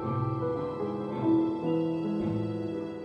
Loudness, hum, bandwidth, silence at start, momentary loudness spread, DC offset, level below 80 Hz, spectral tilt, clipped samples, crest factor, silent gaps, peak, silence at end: -30 LUFS; none; 5.6 kHz; 0 s; 7 LU; under 0.1%; -60 dBFS; -10 dB/octave; under 0.1%; 14 dB; none; -16 dBFS; 0 s